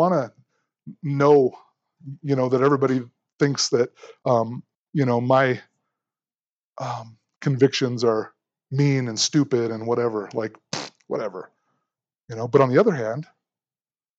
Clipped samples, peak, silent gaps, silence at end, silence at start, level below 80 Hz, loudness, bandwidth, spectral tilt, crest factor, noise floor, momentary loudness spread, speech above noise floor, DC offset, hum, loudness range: under 0.1%; -4 dBFS; 3.33-3.38 s, 4.75-4.93 s, 6.42-6.73 s, 7.36-7.41 s; 0.95 s; 0 s; -74 dBFS; -22 LUFS; 8.2 kHz; -5.5 dB/octave; 20 dB; under -90 dBFS; 16 LU; over 69 dB; under 0.1%; none; 4 LU